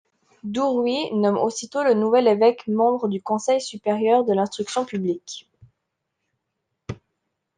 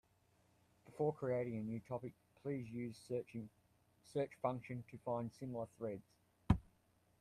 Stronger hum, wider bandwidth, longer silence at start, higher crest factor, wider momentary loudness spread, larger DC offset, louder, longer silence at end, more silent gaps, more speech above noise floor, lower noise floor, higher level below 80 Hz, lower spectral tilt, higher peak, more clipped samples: neither; second, 9.8 kHz vs 14 kHz; second, 0.45 s vs 0.85 s; second, 18 dB vs 28 dB; first, 20 LU vs 12 LU; neither; first, -21 LUFS vs -44 LUFS; about the same, 0.65 s vs 0.6 s; neither; first, 58 dB vs 32 dB; about the same, -79 dBFS vs -76 dBFS; about the same, -64 dBFS vs -60 dBFS; second, -5 dB/octave vs -8.5 dB/octave; first, -4 dBFS vs -18 dBFS; neither